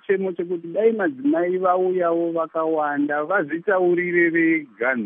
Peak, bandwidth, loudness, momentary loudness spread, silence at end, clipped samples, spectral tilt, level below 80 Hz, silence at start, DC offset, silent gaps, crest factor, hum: -6 dBFS; 3.7 kHz; -21 LUFS; 5 LU; 0 s; under 0.1%; -5.5 dB/octave; -82 dBFS; 0.1 s; under 0.1%; none; 14 dB; none